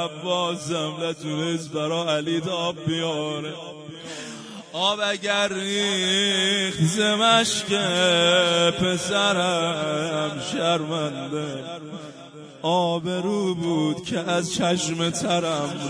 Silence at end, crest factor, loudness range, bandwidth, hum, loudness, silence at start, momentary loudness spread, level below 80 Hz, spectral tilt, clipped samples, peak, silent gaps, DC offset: 0 s; 16 dB; 7 LU; 10.5 kHz; none; -22 LUFS; 0 s; 16 LU; -62 dBFS; -3.5 dB/octave; under 0.1%; -6 dBFS; none; under 0.1%